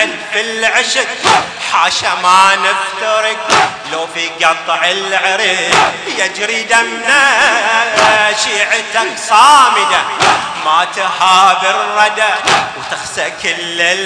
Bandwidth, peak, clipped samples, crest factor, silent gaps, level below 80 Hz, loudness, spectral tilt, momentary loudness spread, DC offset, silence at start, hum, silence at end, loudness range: 11 kHz; 0 dBFS; 1%; 12 dB; none; -52 dBFS; -11 LUFS; -0.5 dB/octave; 8 LU; under 0.1%; 0 s; none; 0 s; 3 LU